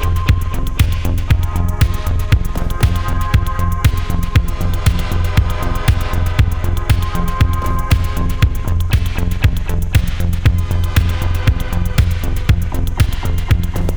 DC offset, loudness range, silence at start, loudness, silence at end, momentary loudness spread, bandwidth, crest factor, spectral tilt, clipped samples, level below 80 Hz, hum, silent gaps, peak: under 0.1%; 0 LU; 0 s; -17 LUFS; 0 s; 3 LU; over 20 kHz; 12 dB; -6 dB/octave; under 0.1%; -18 dBFS; none; none; -2 dBFS